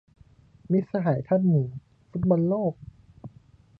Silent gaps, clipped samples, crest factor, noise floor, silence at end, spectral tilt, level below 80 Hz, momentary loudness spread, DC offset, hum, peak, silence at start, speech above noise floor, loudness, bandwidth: none; under 0.1%; 16 dB; -55 dBFS; 0.5 s; -12.5 dB/octave; -56 dBFS; 24 LU; under 0.1%; none; -10 dBFS; 0.7 s; 31 dB; -25 LUFS; 4.5 kHz